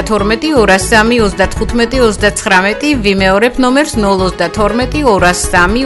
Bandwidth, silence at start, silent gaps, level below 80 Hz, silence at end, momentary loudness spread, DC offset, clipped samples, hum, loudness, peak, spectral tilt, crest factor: 12 kHz; 0 s; none; -24 dBFS; 0 s; 4 LU; under 0.1%; 0.2%; none; -10 LUFS; 0 dBFS; -4 dB/octave; 10 dB